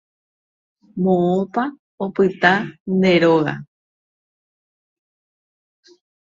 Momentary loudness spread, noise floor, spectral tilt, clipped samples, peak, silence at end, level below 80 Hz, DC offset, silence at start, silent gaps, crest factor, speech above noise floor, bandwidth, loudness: 13 LU; under -90 dBFS; -7.5 dB/octave; under 0.1%; 0 dBFS; 2.55 s; -62 dBFS; under 0.1%; 0.95 s; 1.79-1.98 s, 2.80-2.85 s; 22 dB; over 73 dB; 7.4 kHz; -18 LUFS